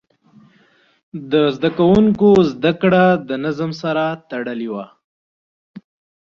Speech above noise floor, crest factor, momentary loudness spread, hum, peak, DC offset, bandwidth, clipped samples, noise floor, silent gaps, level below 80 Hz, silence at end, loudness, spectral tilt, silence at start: 40 dB; 16 dB; 14 LU; none; -2 dBFS; under 0.1%; 7 kHz; under 0.1%; -55 dBFS; 5.04-5.74 s; -50 dBFS; 0.4 s; -16 LUFS; -8 dB/octave; 1.15 s